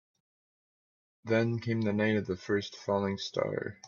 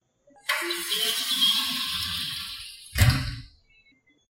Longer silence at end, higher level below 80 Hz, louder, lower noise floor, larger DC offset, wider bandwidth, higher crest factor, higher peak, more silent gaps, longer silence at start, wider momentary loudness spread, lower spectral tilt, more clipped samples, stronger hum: second, 0 s vs 0.85 s; second, -72 dBFS vs -40 dBFS; second, -31 LUFS vs -25 LUFS; first, under -90 dBFS vs -62 dBFS; neither; second, 7.2 kHz vs 16.5 kHz; about the same, 18 dB vs 22 dB; second, -14 dBFS vs -6 dBFS; neither; first, 1.25 s vs 0.45 s; second, 4 LU vs 15 LU; first, -6.5 dB/octave vs -2.5 dB/octave; neither; neither